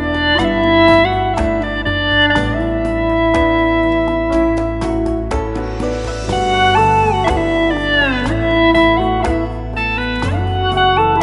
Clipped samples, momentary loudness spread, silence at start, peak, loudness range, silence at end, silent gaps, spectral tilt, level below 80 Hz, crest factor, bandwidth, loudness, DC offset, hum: under 0.1%; 9 LU; 0 s; 0 dBFS; 3 LU; 0 s; none; -6 dB/octave; -26 dBFS; 14 dB; 11.5 kHz; -15 LUFS; under 0.1%; none